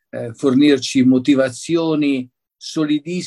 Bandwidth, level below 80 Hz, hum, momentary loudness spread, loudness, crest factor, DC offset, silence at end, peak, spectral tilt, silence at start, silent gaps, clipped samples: 11.5 kHz; -62 dBFS; none; 13 LU; -17 LUFS; 14 dB; under 0.1%; 0 s; -2 dBFS; -5.5 dB/octave; 0.15 s; none; under 0.1%